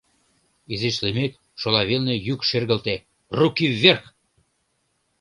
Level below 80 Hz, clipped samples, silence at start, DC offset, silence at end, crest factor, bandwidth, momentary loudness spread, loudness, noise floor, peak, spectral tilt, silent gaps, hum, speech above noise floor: -54 dBFS; under 0.1%; 0.7 s; under 0.1%; 1.2 s; 24 dB; 11.5 kHz; 13 LU; -21 LUFS; -70 dBFS; 0 dBFS; -5.5 dB/octave; none; none; 49 dB